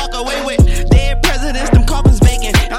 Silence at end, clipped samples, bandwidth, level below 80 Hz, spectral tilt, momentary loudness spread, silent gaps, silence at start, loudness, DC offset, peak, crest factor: 0 s; under 0.1%; 16.5 kHz; -14 dBFS; -5 dB/octave; 7 LU; none; 0 s; -13 LUFS; under 0.1%; 0 dBFS; 10 dB